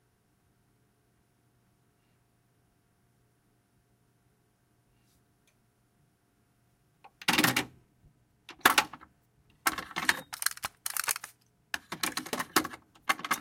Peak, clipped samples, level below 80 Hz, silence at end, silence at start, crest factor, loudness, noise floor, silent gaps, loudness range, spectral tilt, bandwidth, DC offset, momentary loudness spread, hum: -4 dBFS; under 0.1%; -70 dBFS; 0 s; 7.05 s; 32 dB; -30 LUFS; -71 dBFS; none; 4 LU; -1.5 dB/octave; 17 kHz; under 0.1%; 15 LU; none